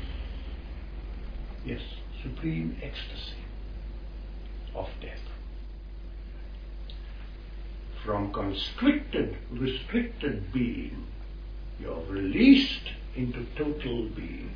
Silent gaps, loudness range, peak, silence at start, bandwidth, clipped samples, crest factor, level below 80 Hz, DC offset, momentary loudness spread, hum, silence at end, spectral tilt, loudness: none; 15 LU; -6 dBFS; 0 s; 5.2 kHz; under 0.1%; 24 dB; -38 dBFS; under 0.1%; 17 LU; none; 0 s; -7.5 dB/octave; -30 LUFS